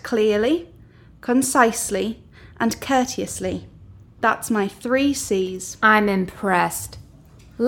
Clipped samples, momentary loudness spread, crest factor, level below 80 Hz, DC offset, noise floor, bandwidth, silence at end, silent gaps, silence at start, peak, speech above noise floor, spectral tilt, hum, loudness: under 0.1%; 12 LU; 20 dB; -50 dBFS; under 0.1%; -47 dBFS; 18.5 kHz; 0 s; none; 0.05 s; -2 dBFS; 27 dB; -4 dB/octave; none; -21 LUFS